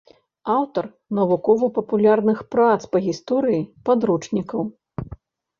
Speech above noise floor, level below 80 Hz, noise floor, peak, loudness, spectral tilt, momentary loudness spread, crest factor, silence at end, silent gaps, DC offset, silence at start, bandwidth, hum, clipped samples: 23 dB; -54 dBFS; -43 dBFS; -4 dBFS; -21 LUFS; -7.5 dB/octave; 13 LU; 16 dB; 0.45 s; none; under 0.1%; 0.45 s; 7.4 kHz; none; under 0.1%